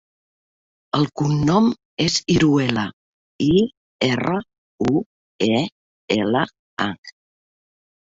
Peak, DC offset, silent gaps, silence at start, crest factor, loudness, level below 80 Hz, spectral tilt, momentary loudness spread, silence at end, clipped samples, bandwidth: -2 dBFS; under 0.1%; 1.85-1.97 s, 2.93-3.39 s, 3.77-3.99 s, 4.58-4.78 s, 5.06-5.39 s, 5.72-6.08 s, 6.59-6.77 s, 6.98-7.03 s; 0.95 s; 20 dB; -21 LUFS; -50 dBFS; -5.5 dB/octave; 9 LU; 1.1 s; under 0.1%; 8 kHz